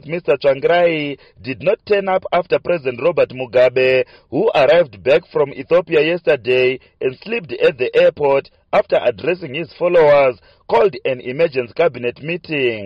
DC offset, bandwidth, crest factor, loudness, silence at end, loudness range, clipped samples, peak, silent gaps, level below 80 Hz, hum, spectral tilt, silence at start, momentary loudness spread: under 0.1%; 6.2 kHz; 12 dB; -16 LUFS; 0 s; 2 LU; under 0.1%; -4 dBFS; none; -54 dBFS; none; -7 dB/octave; 0.05 s; 10 LU